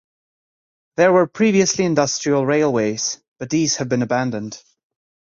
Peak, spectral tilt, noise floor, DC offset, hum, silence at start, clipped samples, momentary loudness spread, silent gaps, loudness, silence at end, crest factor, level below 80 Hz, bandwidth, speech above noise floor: -2 dBFS; -4.5 dB/octave; under -90 dBFS; under 0.1%; none; 1 s; under 0.1%; 14 LU; 3.28-3.36 s; -18 LUFS; 0.65 s; 18 dB; -60 dBFS; 7.6 kHz; over 72 dB